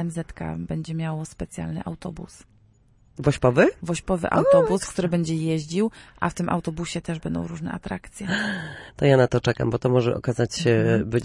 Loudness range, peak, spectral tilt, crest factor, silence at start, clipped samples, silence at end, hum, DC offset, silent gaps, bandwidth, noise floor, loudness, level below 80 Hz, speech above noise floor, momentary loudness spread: 6 LU; -4 dBFS; -6.5 dB/octave; 18 dB; 0 s; under 0.1%; 0 s; none; under 0.1%; none; 11.5 kHz; -57 dBFS; -24 LUFS; -48 dBFS; 34 dB; 14 LU